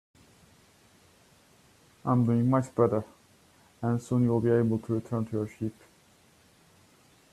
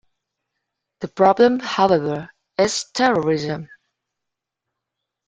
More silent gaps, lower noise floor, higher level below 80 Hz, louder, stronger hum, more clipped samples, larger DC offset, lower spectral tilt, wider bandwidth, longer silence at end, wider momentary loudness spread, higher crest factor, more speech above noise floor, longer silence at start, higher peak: neither; second, -61 dBFS vs -83 dBFS; about the same, -64 dBFS vs -60 dBFS; second, -28 LUFS vs -18 LUFS; neither; neither; neither; first, -9 dB/octave vs -4.5 dB/octave; first, 12.5 kHz vs 9.4 kHz; about the same, 1.6 s vs 1.65 s; second, 12 LU vs 15 LU; about the same, 20 dB vs 20 dB; second, 34 dB vs 65 dB; first, 2.05 s vs 1 s; second, -10 dBFS vs -2 dBFS